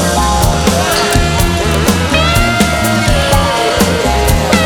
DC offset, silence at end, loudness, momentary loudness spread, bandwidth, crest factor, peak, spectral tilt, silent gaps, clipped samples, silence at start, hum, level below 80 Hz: under 0.1%; 0 s; -11 LUFS; 2 LU; over 20 kHz; 10 dB; 0 dBFS; -4 dB/octave; none; under 0.1%; 0 s; none; -18 dBFS